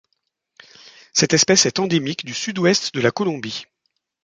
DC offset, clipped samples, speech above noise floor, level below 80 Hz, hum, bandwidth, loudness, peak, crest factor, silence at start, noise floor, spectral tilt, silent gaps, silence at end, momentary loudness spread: under 0.1%; under 0.1%; 54 dB; -60 dBFS; none; 11 kHz; -18 LUFS; -2 dBFS; 18 dB; 1.15 s; -74 dBFS; -3 dB/octave; none; 0.6 s; 12 LU